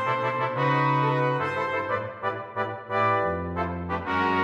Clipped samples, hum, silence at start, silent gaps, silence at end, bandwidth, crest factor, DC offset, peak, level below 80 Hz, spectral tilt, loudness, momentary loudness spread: under 0.1%; none; 0 s; none; 0 s; 7.8 kHz; 14 dB; under 0.1%; -10 dBFS; -54 dBFS; -7.5 dB/octave; -26 LUFS; 8 LU